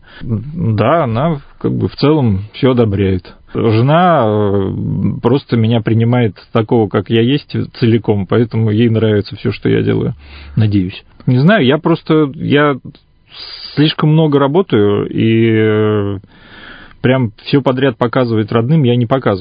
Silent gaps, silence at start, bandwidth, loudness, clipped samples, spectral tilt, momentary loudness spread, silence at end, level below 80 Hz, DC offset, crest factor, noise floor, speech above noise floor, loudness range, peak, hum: none; 0.15 s; 5.2 kHz; -13 LUFS; under 0.1%; -10.5 dB/octave; 9 LU; 0 s; -38 dBFS; under 0.1%; 12 dB; -35 dBFS; 23 dB; 2 LU; 0 dBFS; none